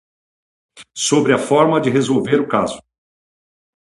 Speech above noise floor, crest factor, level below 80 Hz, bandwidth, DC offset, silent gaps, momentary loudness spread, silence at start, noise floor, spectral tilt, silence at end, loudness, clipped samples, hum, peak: over 74 dB; 18 dB; -58 dBFS; 11.5 kHz; under 0.1%; none; 10 LU; 0.75 s; under -90 dBFS; -4.5 dB/octave; 1 s; -16 LUFS; under 0.1%; none; 0 dBFS